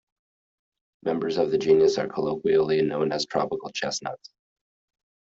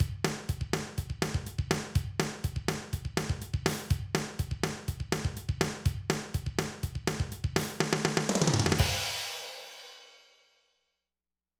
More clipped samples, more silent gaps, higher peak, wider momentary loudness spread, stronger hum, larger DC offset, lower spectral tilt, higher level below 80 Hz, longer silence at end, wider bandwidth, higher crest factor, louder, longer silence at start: neither; neither; first, -8 dBFS vs -12 dBFS; about the same, 11 LU vs 9 LU; neither; neither; about the same, -5 dB/octave vs -4.5 dB/octave; second, -64 dBFS vs -44 dBFS; second, 1.05 s vs 1.45 s; second, 8 kHz vs over 20 kHz; about the same, 18 dB vs 20 dB; first, -24 LUFS vs -32 LUFS; first, 1.05 s vs 0 s